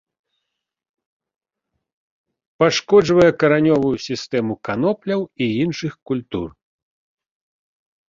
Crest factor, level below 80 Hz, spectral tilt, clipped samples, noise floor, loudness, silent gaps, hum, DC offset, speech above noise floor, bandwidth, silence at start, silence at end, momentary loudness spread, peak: 20 dB; -54 dBFS; -6 dB/octave; under 0.1%; -78 dBFS; -18 LUFS; 6.02-6.06 s; none; under 0.1%; 60 dB; 7.6 kHz; 2.6 s; 1.6 s; 12 LU; 0 dBFS